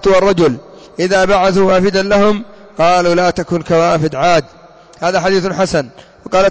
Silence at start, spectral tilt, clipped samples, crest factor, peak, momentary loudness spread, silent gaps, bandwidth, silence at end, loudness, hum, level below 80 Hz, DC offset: 0 s; -5.5 dB/octave; under 0.1%; 10 dB; -4 dBFS; 9 LU; none; 8 kHz; 0 s; -13 LUFS; none; -40 dBFS; under 0.1%